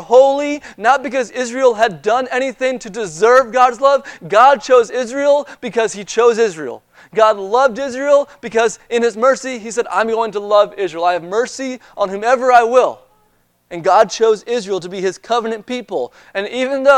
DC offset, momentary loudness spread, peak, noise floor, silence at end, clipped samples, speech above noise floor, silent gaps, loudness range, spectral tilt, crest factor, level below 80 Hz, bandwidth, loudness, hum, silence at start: under 0.1%; 12 LU; 0 dBFS; -58 dBFS; 0 s; under 0.1%; 43 dB; none; 4 LU; -3.5 dB/octave; 14 dB; -58 dBFS; 10.5 kHz; -15 LUFS; none; 0 s